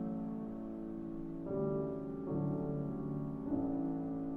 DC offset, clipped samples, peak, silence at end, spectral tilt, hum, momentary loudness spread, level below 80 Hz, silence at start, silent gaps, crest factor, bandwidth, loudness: under 0.1%; under 0.1%; -24 dBFS; 0 s; -12 dB/octave; none; 7 LU; -58 dBFS; 0 s; none; 14 dB; 3.2 kHz; -40 LUFS